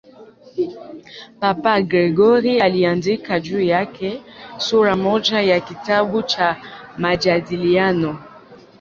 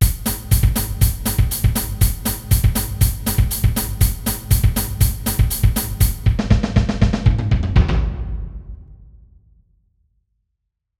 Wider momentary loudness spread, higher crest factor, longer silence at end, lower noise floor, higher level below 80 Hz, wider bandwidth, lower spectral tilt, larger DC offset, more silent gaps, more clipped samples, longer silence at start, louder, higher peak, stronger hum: first, 17 LU vs 7 LU; about the same, 16 dB vs 18 dB; second, 0.25 s vs 1.95 s; second, -44 dBFS vs -76 dBFS; second, -54 dBFS vs -22 dBFS; second, 7.4 kHz vs 18 kHz; about the same, -5.5 dB/octave vs -5 dB/octave; second, under 0.1% vs 0.1%; neither; neither; first, 0.2 s vs 0 s; about the same, -18 LUFS vs -19 LUFS; about the same, -2 dBFS vs 0 dBFS; neither